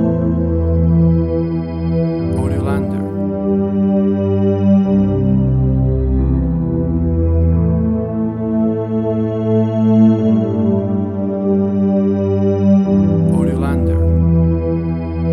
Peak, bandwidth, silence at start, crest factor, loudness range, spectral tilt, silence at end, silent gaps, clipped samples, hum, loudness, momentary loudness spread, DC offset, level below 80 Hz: -2 dBFS; 9.6 kHz; 0 s; 12 dB; 2 LU; -11 dB/octave; 0 s; none; under 0.1%; none; -15 LUFS; 6 LU; 0.1%; -26 dBFS